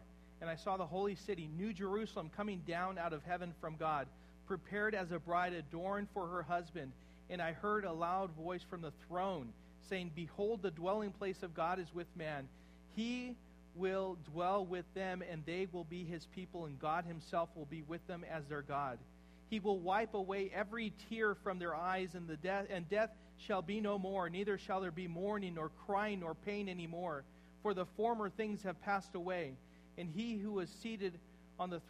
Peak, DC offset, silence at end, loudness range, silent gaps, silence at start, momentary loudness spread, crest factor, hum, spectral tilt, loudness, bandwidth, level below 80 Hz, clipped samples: -24 dBFS; under 0.1%; 0 s; 3 LU; none; 0 s; 10 LU; 18 dB; none; -6.5 dB/octave; -42 LUFS; 13 kHz; -64 dBFS; under 0.1%